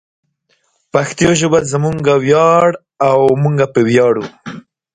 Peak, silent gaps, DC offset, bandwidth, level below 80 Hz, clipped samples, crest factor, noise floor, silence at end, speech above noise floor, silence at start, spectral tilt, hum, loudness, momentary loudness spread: 0 dBFS; none; under 0.1%; 9.6 kHz; -48 dBFS; under 0.1%; 14 dB; -61 dBFS; 0.35 s; 50 dB; 0.95 s; -5.5 dB/octave; none; -13 LUFS; 8 LU